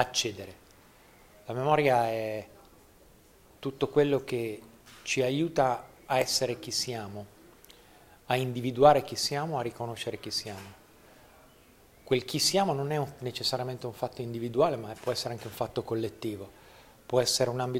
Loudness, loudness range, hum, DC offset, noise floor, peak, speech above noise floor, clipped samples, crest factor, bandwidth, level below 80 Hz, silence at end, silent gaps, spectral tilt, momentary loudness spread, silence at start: -29 LUFS; 4 LU; none; under 0.1%; -58 dBFS; -6 dBFS; 29 dB; under 0.1%; 24 dB; 16 kHz; -62 dBFS; 0 s; none; -4 dB/octave; 15 LU; 0 s